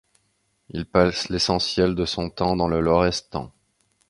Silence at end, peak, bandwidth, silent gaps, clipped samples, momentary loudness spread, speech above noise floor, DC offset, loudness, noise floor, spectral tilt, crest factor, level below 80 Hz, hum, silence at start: 0.6 s; -2 dBFS; 11.5 kHz; none; under 0.1%; 14 LU; 47 dB; under 0.1%; -22 LUFS; -69 dBFS; -5 dB/octave; 22 dB; -42 dBFS; none; 0.75 s